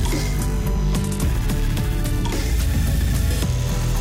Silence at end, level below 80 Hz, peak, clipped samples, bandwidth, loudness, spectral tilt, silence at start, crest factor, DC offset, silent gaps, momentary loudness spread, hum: 0 s; -22 dBFS; -10 dBFS; under 0.1%; 16.5 kHz; -22 LUFS; -5.5 dB/octave; 0 s; 10 dB; under 0.1%; none; 2 LU; none